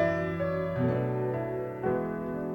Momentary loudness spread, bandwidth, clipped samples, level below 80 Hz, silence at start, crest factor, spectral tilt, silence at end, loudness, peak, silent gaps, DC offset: 5 LU; 17 kHz; under 0.1%; -56 dBFS; 0 s; 16 dB; -9.5 dB/octave; 0 s; -31 LUFS; -14 dBFS; none; under 0.1%